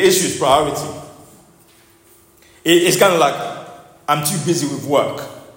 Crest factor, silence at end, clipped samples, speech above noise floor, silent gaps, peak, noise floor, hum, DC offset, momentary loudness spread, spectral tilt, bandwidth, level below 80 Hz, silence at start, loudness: 18 dB; 0.05 s; under 0.1%; 35 dB; none; 0 dBFS; -50 dBFS; none; under 0.1%; 17 LU; -3.5 dB/octave; 16.5 kHz; -52 dBFS; 0 s; -16 LUFS